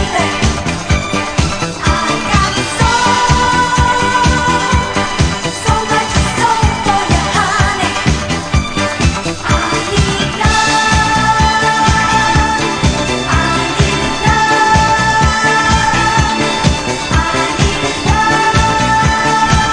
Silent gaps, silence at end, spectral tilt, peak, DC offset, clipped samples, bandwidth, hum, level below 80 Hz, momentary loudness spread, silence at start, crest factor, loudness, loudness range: none; 0 s; -4 dB/octave; 0 dBFS; 0.3%; under 0.1%; 10.5 kHz; none; -22 dBFS; 5 LU; 0 s; 12 dB; -12 LUFS; 2 LU